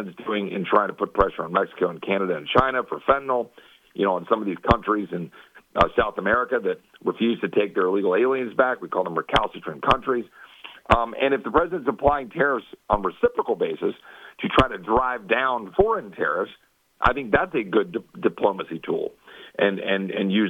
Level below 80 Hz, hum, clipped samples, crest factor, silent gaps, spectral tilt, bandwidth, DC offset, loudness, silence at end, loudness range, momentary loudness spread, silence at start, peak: -44 dBFS; none; under 0.1%; 22 dB; none; -7 dB/octave; 9.8 kHz; under 0.1%; -23 LUFS; 0 s; 2 LU; 9 LU; 0 s; -2 dBFS